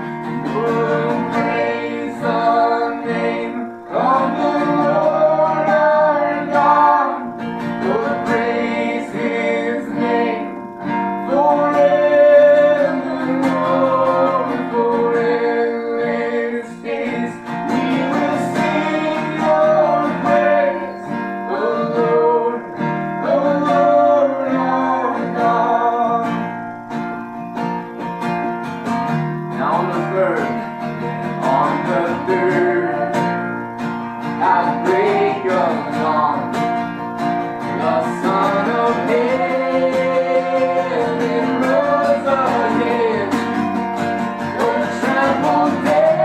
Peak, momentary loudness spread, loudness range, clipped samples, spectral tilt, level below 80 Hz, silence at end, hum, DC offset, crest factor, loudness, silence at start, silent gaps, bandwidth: -2 dBFS; 10 LU; 5 LU; under 0.1%; -6.5 dB/octave; -62 dBFS; 0 s; none; under 0.1%; 16 dB; -17 LUFS; 0 s; none; 12.5 kHz